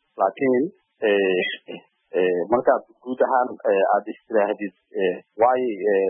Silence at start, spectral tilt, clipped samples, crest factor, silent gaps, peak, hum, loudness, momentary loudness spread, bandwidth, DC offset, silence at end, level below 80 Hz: 0.15 s; -10 dB/octave; under 0.1%; 16 dB; none; -6 dBFS; none; -22 LUFS; 10 LU; 3.6 kHz; under 0.1%; 0 s; -68 dBFS